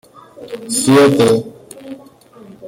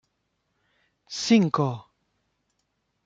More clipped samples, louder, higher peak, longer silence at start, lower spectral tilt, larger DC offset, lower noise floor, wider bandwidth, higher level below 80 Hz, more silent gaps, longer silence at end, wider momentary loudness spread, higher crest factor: neither; first, -12 LUFS vs -23 LUFS; first, 0 dBFS vs -8 dBFS; second, 0.4 s vs 1.1 s; about the same, -4.5 dB/octave vs -5.5 dB/octave; neither; second, -41 dBFS vs -76 dBFS; first, 16.5 kHz vs 7.8 kHz; first, -54 dBFS vs -70 dBFS; neither; second, 0 s vs 1.25 s; first, 25 LU vs 17 LU; about the same, 16 dB vs 20 dB